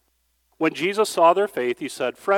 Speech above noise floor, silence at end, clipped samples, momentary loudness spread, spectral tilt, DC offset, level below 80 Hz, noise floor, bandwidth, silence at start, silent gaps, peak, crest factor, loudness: 48 dB; 0 s; under 0.1%; 9 LU; -4 dB/octave; under 0.1%; -72 dBFS; -68 dBFS; 17 kHz; 0.6 s; none; -4 dBFS; 18 dB; -22 LUFS